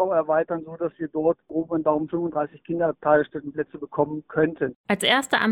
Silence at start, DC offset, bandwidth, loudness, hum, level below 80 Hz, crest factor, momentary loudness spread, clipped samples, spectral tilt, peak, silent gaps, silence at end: 0 s; under 0.1%; 15 kHz; -24 LUFS; none; -60 dBFS; 18 dB; 10 LU; under 0.1%; -4.5 dB/octave; -6 dBFS; 4.75-4.84 s; 0 s